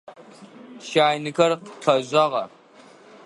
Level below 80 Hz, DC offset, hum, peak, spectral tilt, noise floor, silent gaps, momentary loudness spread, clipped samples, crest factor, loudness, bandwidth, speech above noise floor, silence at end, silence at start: -70 dBFS; under 0.1%; none; -2 dBFS; -4.5 dB/octave; -50 dBFS; none; 10 LU; under 0.1%; 22 dB; -21 LUFS; 11.5 kHz; 29 dB; 0.8 s; 0.1 s